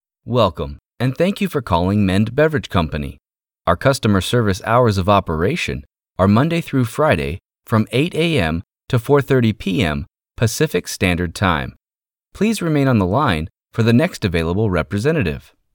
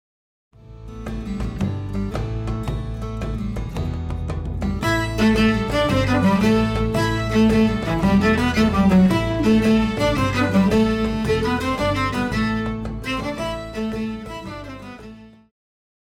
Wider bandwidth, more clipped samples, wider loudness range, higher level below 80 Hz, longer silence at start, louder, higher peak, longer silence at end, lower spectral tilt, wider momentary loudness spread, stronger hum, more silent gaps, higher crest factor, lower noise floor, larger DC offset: first, 19 kHz vs 15.5 kHz; neither; second, 2 LU vs 10 LU; second, -38 dBFS vs -32 dBFS; second, 0.25 s vs 0.65 s; about the same, -18 LUFS vs -20 LUFS; first, -2 dBFS vs -6 dBFS; second, 0.35 s vs 0.75 s; about the same, -6 dB/octave vs -6.5 dB/octave; second, 9 LU vs 12 LU; neither; neither; about the same, 16 dB vs 14 dB; first, under -90 dBFS vs -41 dBFS; neither